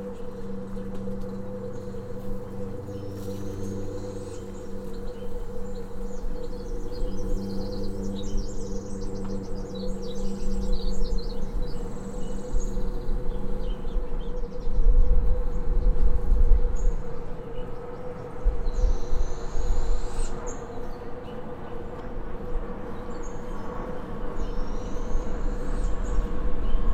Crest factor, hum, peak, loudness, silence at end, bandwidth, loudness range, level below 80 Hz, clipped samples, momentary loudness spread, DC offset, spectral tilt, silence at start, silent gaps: 18 dB; none; -6 dBFS; -33 LUFS; 0 s; 8.4 kHz; 8 LU; -26 dBFS; under 0.1%; 10 LU; under 0.1%; -7 dB/octave; 0 s; none